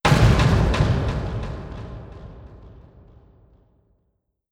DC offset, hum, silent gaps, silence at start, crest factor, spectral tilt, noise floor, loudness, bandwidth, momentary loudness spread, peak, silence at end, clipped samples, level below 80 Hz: under 0.1%; none; none; 0.05 s; 20 dB; -6.5 dB/octave; -72 dBFS; -20 LUFS; 14.5 kHz; 25 LU; -2 dBFS; 1.8 s; under 0.1%; -30 dBFS